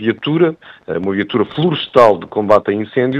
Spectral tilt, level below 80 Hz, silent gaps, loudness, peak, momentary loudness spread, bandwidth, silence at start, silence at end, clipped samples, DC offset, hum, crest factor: -7.5 dB/octave; -54 dBFS; none; -15 LUFS; 0 dBFS; 9 LU; 9.2 kHz; 0 s; 0 s; 0.1%; under 0.1%; none; 14 dB